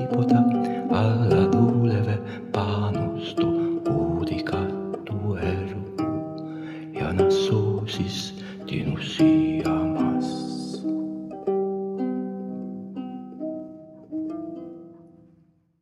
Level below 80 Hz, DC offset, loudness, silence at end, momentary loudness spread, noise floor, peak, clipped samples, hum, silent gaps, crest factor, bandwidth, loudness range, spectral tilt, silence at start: -52 dBFS; under 0.1%; -25 LUFS; 0.75 s; 15 LU; -60 dBFS; -6 dBFS; under 0.1%; none; none; 18 dB; 11.5 kHz; 8 LU; -7.5 dB/octave; 0 s